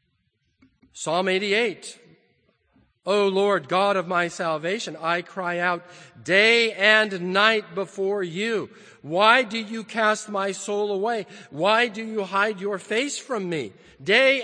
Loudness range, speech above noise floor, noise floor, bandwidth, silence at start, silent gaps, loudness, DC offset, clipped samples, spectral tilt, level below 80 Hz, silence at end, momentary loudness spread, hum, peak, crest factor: 4 LU; 48 dB; -71 dBFS; 9.8 kHz; 0.95 s; none; -22 LUFS; under 0.1%; under 0.1%; -3.5 dB/octave; -74 dBFS; 0 s; 13 LU; none; -2 dBFS; 22 dB